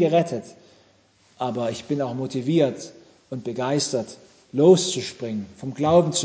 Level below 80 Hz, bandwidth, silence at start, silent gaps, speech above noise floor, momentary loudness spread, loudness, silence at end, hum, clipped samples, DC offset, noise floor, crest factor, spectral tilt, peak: -60 dBFS; 8 kHz; 0 s; none; 37 dB; 16 LU; -23 LUFS; 0 s; none; under 0.1%; under 0.1%; -59 dBFS; 18 dB; -5.5 dB/octave; -4 dBFS